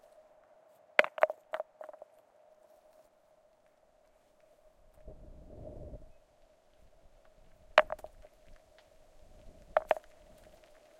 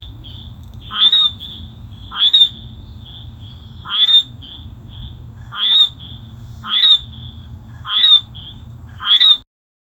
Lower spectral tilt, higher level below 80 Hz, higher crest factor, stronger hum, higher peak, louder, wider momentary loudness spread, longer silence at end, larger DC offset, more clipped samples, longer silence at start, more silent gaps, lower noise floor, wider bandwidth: about the same, -3.5 dB/octave vs -2.5 dB/octave; second, -60 dBFS vs -42 dBFS; first, 38 dB vs 18 dB; neither; about the same, 0 dBFS vs 0 dBFS; second, -32 LUFS vs -11 LUFS; about the same, 27 LU vs 25 LU; first, 1.05 s vs 0.6 s; neither; neither; first, 1 s vs 0 s; neither; first, -67 dBFS vs -34 dBFS; about the same, 15.5 kHz vs 16.5 kHz